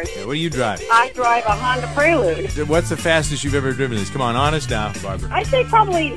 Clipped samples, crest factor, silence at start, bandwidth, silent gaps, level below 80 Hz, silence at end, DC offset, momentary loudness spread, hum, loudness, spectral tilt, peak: under 0.1%; 18 dB; 0 s; 11 kHz; none; -34 dBFS; 0 s; 1%; 7 LU; none; -18 LUFS; -4.5 dB/octave; 0 dBFS